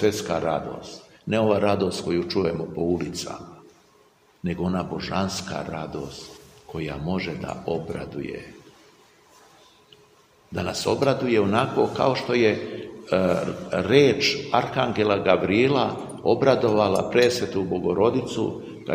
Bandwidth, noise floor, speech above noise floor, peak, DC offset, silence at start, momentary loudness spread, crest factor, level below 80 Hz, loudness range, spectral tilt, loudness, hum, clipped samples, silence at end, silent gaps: 15.5 kHz; -58 dBFS; 35 dB; -2 dBFS; under 0.1%; 0 s; 15 LU; 22 dB; -54 dBFS; 11 LU; -5.5 dB/octave; -23 LUFS; none; under 0.1%; 0 s; none